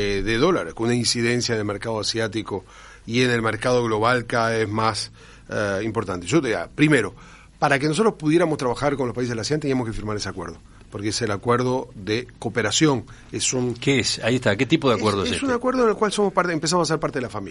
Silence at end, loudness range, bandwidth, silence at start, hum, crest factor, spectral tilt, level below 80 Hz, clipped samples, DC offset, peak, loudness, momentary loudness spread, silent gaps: 0 s; 4 LU; 11.5 kHz; 0 s; none; 18 dB; -4.5 dB/octave; -46 dBFS; under 0.1%; under 0.1%; -4 dBFS; -22 LUFS; 9 LU; none